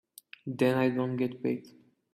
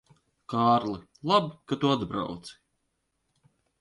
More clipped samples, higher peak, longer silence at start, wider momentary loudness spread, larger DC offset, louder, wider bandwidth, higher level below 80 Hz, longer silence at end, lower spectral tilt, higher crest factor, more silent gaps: neither; second, -12 dBFS vs -8 dBFS; about the same, 0.45 s vs 0.5 s; first, 16 LU vs 13 LU; neither; second, -30 LUFS vs -27 LUFS; first, 15 kHz vs 11.5 kHz; second, -72 dBFS vs -62 dBFS; second, 0.45 s vs 1.3 s; about the same, -7.5 dB/octave vs -6.5 dB/octave; about the same, 20 dB vs 20 dB; neither